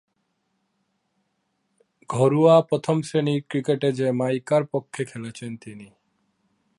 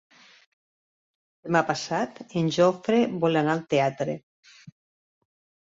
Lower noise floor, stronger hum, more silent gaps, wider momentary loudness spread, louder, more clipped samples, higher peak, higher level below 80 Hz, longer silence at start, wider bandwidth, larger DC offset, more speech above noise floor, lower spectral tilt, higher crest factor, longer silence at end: second, -73 dBFS vs under -90 dBFS; neither; second, none vs 4.23-4.43 s; first, 18 LU vs 10 LU; first, -22 LUFS vs -25 LUFS; neither; first, -4 dBFS vs -8 dBFS; about the same, -70 dBFS vs -68 dBFS; first, 2.1 s vs 1.45 s; first, 11.5 kHz vs 7.8 kHz; neither; second, 51 dB vs over 66 dB; about the same, -7 dB/octave vs -6 dB/octave; about the same, 20 dB vs 20 dB; about the same, 0.95 s vs 1.05 s